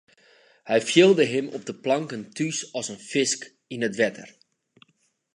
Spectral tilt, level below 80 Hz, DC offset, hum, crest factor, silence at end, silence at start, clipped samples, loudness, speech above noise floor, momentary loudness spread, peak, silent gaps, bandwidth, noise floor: -4 dB/octave; -76 dBFS; under 0.1%; none; 20 dB; 1.1 s; 0.65 s; under 0.1%; -24 LUFS; 45 dB; 15 LU; -6 dBFS; none; 11 kHz; -69 dBFS